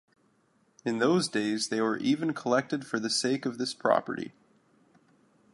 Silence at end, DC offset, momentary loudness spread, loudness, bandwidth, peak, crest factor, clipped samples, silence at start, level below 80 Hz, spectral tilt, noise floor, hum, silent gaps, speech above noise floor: 1.25 s; under 0.1%; 9 LU; -29 LUFS; 11.5 kHz; -10 dBFS; 20 dB; under 0.1%; 0.85 s; -76 dBFS; -4 dB/octave; -68 dBFS; none; none; 40 dB